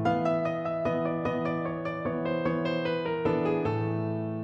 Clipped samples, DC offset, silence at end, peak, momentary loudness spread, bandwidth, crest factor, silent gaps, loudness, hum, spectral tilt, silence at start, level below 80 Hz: under 0.1%; under 0.1%; 0 s; -14 dBFS; 4 LU; 7.2 kHz; 14 dB; none; -29 LUFS; none; -8.5 dB/octave; 0 s; -58 dBFS